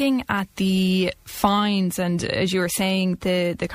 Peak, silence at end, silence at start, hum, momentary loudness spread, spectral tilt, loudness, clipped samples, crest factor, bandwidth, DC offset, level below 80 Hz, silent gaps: -4 dBFS; 0 s; 0 s; none; 4 LU; -5 dB/octave; -22 LUFS; under 0.1%; 18 dB; 15.5 kHz; under 0.1%; -48 dBFS; none